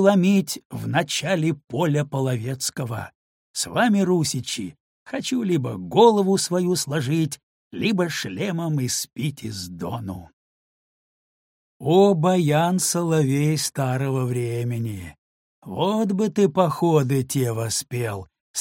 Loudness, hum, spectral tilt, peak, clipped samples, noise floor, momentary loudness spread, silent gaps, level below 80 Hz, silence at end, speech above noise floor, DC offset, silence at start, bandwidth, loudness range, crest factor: -22 LUFS; none; -5 dB/octave; -2 dBFS; under 0.1%; under -90 dBFS; 14 LU; 0.65-0.70 s, 3.15-3.54 s, 4.80-5.06 s, 7.43-7.71 s, 10.33-11.80 s, 15.18-15.62 s, 18.40-18.54 s; -60 dBFS; 0 s; over 68 dB; under 0.1%; 0 s; 17 kHz; 6 LU; 20 dB